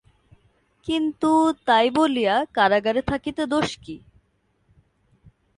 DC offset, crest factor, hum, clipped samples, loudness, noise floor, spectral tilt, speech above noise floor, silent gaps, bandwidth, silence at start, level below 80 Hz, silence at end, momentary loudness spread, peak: under 0.1%; 18 dB; none; under 0.1%; -21 LUFS; -67 dBFS; -5 dB/octave; 46 dB; none; 11 kHz; 0.85 s; -52 dBFS; 1.6 s; 15 LU; -6 dBFS